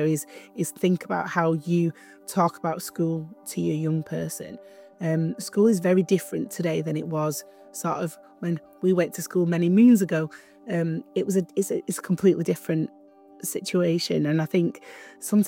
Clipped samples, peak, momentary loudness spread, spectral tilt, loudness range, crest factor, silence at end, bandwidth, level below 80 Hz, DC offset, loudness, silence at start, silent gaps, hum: under 0.1%; -8 dBFS; 13 LU; -6 dB/octave; 4 LU; 16 dB; 0 s; 17.5 kHz; -72 dBFS; under 0.1%; -25 LUFS; 0 s; none; none